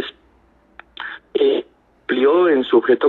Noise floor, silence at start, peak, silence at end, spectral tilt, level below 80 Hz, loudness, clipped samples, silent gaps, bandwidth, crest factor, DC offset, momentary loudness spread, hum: -55 dBFS; 0 s; -2 dBFS; 0 s; -7 dB/octave; -60 dBFS; -17 LUFS; under 0.1%; none; 4.3 kHz; 16 dB; under 0.1%; 17 LU; none